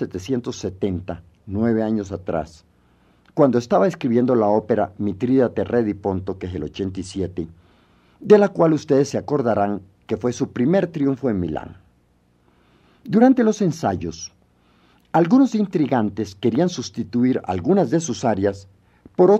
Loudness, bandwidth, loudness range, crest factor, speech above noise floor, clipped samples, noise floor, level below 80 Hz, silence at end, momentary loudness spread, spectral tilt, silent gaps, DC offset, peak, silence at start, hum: -20 LUFS; 9 kHz; 4 LU; 20 dB; 40 dB; under 0.1%; -60 dBFS; -52 dBFS; 0 s; 14 LU; -7 dB/octave; none; under 0.1%; 0 dBFS; 0 s; 60 Hz at -55 dBFS